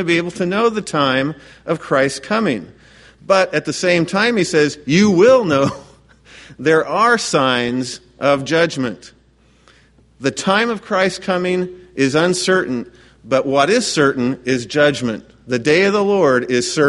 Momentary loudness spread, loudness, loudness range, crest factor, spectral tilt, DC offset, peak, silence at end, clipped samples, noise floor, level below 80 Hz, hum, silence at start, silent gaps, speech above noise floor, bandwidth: 10 LU; -16 LUFS; 5 LU; 16 dB; -4.5 dB/octave; under 0.1%; 0 dBFS; 0 s; under 0.1%; -53 dBFS; -54 dBFS; none; 0 s; none; 37 dB; 11.5 kHz